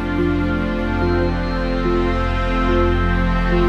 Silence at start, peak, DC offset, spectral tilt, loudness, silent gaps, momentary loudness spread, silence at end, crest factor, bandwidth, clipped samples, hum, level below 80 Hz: 0 s; -4 dBFS; under 0.1%; -8 dB/octave; -19 LUFS; none; 3 LU; 0 s; 12 dB; 6.6 kHz; under 0.1%; none; -22 dBFS